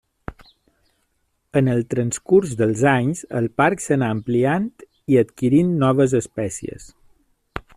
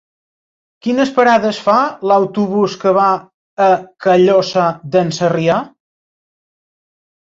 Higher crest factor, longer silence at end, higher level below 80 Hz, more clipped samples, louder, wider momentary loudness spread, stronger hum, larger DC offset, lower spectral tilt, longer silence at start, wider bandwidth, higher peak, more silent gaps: about the same, 18 dB vs 14 dB; second, 0.15 s vs 1.55 s; first, -52 dBFS vs -60 dBFS; neither; second, -20 LUFS vs -14 LUFS; first, 19 LU vs 7 LU; neither; neither; about the same, -6.5 dB/octave vs -6 dB/octave; second, 0.3 s vs 0.85 s; first, 13 kHz vs 7.8 kHz; about the same, -2 dBFS vs 0 dBFS; second, none vs 3.34-3.57 s